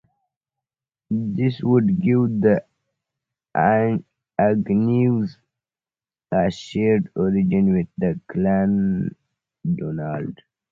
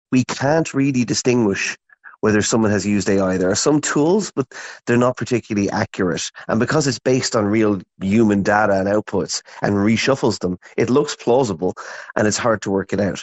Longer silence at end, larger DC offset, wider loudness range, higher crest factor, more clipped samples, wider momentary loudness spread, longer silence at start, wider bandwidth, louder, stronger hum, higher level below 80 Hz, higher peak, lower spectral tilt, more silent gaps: first, 0.35 s vs 0 s; neither; about the same, 2 LU vs 2 LU; about the same, 18 dB vs 18 dB; neither; about the same, 10 LU vs 8 LU; first, 1.1 s vs 0.1 s; second, 7.4 kHz vs 8.4 kHz; about the same, -21 LUFS vs -19 LUFS; neither; about the same, -52 dBFS vs -52 dBFS; second, -4 dBFS vs 0 dBFS; first, -9 dB/octave vs -5 dB/octave; neither